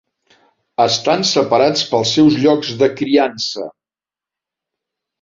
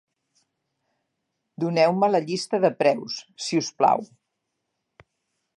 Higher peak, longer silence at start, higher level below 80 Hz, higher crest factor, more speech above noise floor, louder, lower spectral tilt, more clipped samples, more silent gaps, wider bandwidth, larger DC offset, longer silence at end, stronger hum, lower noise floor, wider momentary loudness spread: first, -2 dBFS vs -6 dBFS; second, 0.8 s vs 1.6 s; first, -58 dBFS vs -78 dBFS; about the same, 16 dB vs 20 dB; first, 75 dB vs 57 dB; first, -15 LUFS vs -23 LUFS; about the same, -4.5 dB/octave vs -5 dB/octave; neither; neither; second, 7.6 kHz vs 11.5 kHz; neither; about the same, 1.5 s vs 1.55 s; neither; first, -90 dBFS vs -79 dBFS; about the same, 10 LU vs 10 LU